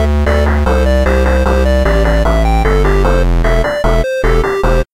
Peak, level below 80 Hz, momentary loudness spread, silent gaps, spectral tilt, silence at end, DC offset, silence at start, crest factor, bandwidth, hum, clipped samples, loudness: 0 dBFS; -12 dBFS; 2 LU; none; -6.5 dB/octave; 0.1 s; 0.4%; 0 s; 10 dB; 15 kHz; none; under 0.1%; -12 LUFS